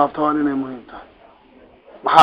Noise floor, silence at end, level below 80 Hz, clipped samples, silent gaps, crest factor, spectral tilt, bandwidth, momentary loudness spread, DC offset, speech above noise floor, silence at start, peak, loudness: -49 dBFS; 0 s; -56 dBFS; under 0.1%; none; 18 dB; -5 dB/octave; 5.2 kHz; 23 LU; under 0.1%; 29 dB; 0 s; 0 dBFS; -20 LUFS